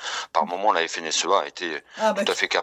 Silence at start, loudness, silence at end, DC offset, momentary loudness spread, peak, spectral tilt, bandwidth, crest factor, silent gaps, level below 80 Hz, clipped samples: 0 s; -23 LUFS; 0 s; under 0.1%; 7 LU; -4 dBFS; -1.5 dB/octave; 16 kHz; 20 dB; none; -74 dBFS; under 0.1%